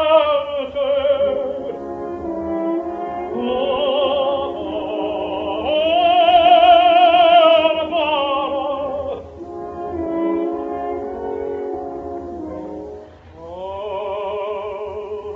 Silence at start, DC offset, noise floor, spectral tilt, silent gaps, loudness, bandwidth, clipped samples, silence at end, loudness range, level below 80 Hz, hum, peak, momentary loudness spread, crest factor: 0 s; under 0.1%; -38 dBFS; -6.5 dB/octave; none; -18 LUFS; 4.7 kHz; under 0.1%; 0 s; 15 LU; -48 dBFS; none; -2 dBFS; 19 LU; 16 dB